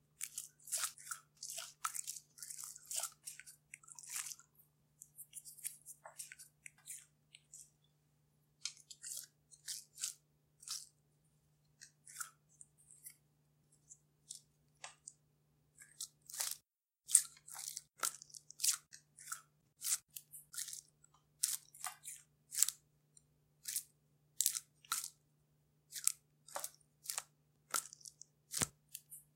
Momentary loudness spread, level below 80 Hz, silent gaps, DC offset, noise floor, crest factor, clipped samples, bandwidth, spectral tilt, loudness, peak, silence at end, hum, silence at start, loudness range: 22 LU; -82 dBFS; none; under 0.1%; -78 dBFS; 42 dB; under 0.1%; 17 kHz; 1 dB/octave; -42 LUFS; -4 dBFS; 0.15 s; none; 0.2 s; 16 LU